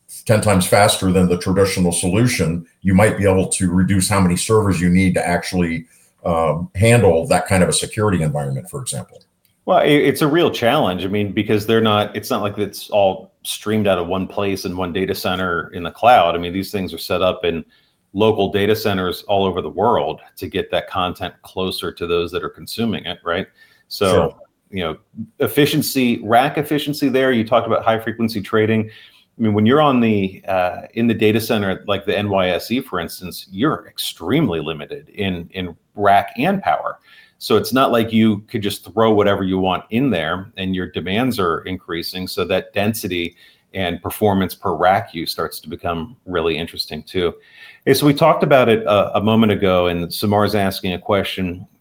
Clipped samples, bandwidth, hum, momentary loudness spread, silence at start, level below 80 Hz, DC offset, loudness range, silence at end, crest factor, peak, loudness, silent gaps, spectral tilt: under 0.1%; 18 kHz; none; 11 LU; 0.1 s; -52 dBFS; under 0.1%; 5 LU; 0.15 s; 18 dB; 0 dBFS; -18 LUFS; none; -5 dB/octave